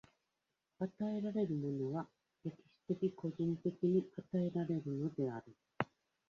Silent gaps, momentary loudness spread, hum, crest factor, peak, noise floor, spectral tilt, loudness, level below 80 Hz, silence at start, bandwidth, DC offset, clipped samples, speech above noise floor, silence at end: none; 12 LU; none; 24 dB; -16 dBFS; -88 dBFS; -8.5 dB/octave; -40 LUFS; -78 dBFS; 0.8 s; 7 kHz; under 0.1%; under 0.1%; 49 dB; 0.45 s